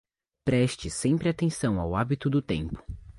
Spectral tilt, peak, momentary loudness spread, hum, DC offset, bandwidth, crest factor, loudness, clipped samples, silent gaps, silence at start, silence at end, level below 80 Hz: -6 dB/octave; -12 dBFS; 7 LU; none; under 0.1%; 11.5 kHz; 16 dB; -28 LUFS; under 0.1%; none; 0.45 s; 0.1 s; -44 dBFS